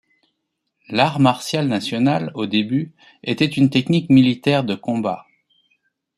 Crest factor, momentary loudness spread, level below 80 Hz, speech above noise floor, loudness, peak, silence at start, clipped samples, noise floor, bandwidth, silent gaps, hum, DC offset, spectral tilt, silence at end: 18 dB; 11 LU; -58 dBFS; 57 dB; -19 LUFS; -2 dBFS; 0.9 s; under 0.1%; -75 dBFS; 12.5 kHz; none; none; under 0.1%; -6.5 dB/octave; 0.95 s